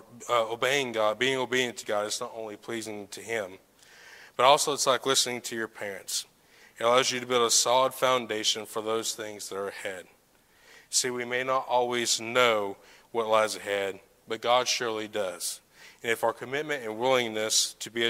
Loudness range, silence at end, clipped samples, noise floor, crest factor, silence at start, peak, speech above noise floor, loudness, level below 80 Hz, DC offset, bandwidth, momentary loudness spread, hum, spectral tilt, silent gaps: 5 LU; 0 s; under 0.1%; -62 dBFS; 24 dB; 0.1 s; -6 dBFS; 34 dB; -27 LUFS; -74 dBFS; under 0.1%; 16 kHz; 13 LU; none; -1.5 dB/octave; none